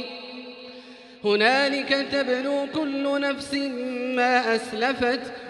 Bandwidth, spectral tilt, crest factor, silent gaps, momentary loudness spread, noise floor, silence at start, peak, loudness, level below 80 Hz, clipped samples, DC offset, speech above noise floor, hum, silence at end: 11.5 kHz; -3.5 dB/octave; 18 dB; none; 18 LU; -45 dBFS; 0 s; -8 dBFS; -24 LUFS; -64 dBFS; under 0.1%; under 0.1%; 21 dB; none; 0 s